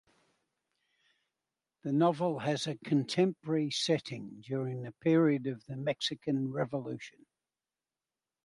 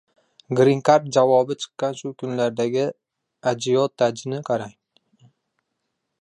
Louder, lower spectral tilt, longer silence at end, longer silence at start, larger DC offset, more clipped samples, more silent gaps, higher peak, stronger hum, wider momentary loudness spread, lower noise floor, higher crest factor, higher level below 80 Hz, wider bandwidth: second, -32 LUFS vs -21 LUFS; about the same, -6 dB/octave vs -5.5 dB/octave; second, 1.35 s vs 1.5 s; first, 1.85 s vs 0.5 s; neither; neither; neither; second, -16 dBFS vs -2 dBFS; neither; about the same, 13 LU vs 11 LU; first, under -90 dBFS vs -77 dBFS; about the same, 18 dB vs 20 dB; second, -76 dBFS vs -70 dBFS; about the same, 11.5 kHz vs 11 kHz